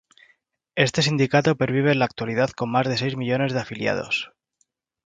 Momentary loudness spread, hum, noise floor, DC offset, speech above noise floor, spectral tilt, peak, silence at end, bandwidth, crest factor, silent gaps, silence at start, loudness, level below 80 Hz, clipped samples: 6 LU; none; -71 dBFS; under 0.1%; 49 dB; -5.5 dB/octave; 0 dBFS; 0.8 s; 9.4 kHz; 22 dB; none; 0.75 s; -22 LUFS; -58 dBFS; under 0.1%